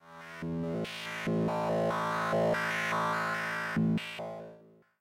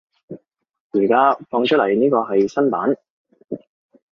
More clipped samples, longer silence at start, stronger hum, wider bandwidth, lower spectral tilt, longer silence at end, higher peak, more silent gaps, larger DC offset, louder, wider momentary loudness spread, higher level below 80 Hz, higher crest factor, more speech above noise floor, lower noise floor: neither; second, 0.05 s vs 0.3 s; neither; first, 16 kHz vs 7 kHz; about the same, -6 dB/octave vs -6.5 dB/octave; second, 0.35 s vs 0.6 s; second, -20 dBFS vs -4 dBFS; second, none vs 0.80-0.90 s, 3.10-3.24 s; neither; second, -32 LUFS vs -18 LUFS; second, 12 LU vs 23 LU; about the same, -64 dBFS vs -64 dBFS; about the same, 14 dB vs 16 dB; about the same, 26 dB vs 24 dB; first, -57 dBFS vs -41 dBFS